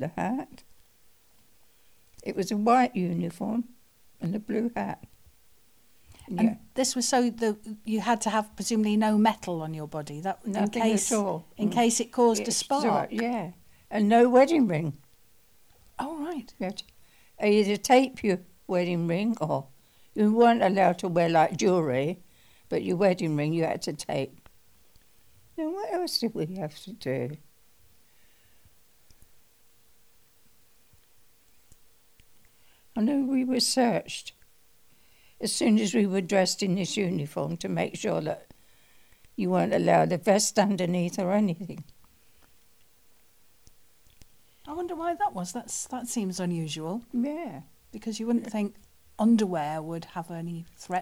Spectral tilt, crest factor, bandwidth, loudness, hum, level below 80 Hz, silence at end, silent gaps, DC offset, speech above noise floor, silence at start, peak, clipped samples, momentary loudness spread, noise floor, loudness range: -5 dB/octave; 20 dB; 16.5 kHz; -27 LUFS; none; -66 dBFS; 0 s; none; 0.1%; 38 dB; 0 s; -8 dBFS; under 0.1%; 14 LU; -64 dBFS; 9 LU